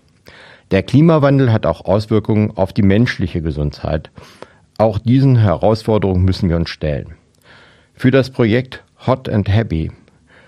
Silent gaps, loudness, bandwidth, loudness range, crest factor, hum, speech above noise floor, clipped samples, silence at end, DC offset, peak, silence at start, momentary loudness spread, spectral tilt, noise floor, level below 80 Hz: none; -15 LUFS; 10.5 kHz; 4 LU; 16 dB; none; 32 dB; under 0.1%; 0.55 s; under 0.1%; 0 dBFS; 0.7 s; 10 LU; -8.5 dB/octave; -46 dBFS; -36 dBFS